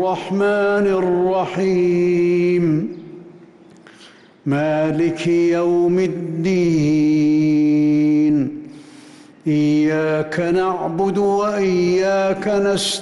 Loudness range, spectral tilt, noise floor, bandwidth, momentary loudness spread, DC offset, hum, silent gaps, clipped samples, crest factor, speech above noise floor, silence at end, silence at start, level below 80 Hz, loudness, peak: 4 LU; -6.5 dB/octave; -46 dBFS; 12 kHz; 6 LU; under 0.1%; none; none; under 0.1%; 8 dB; 29 dB; 0 s; 0 s; -54 dBFS; -17 LUFS; -10 dBFS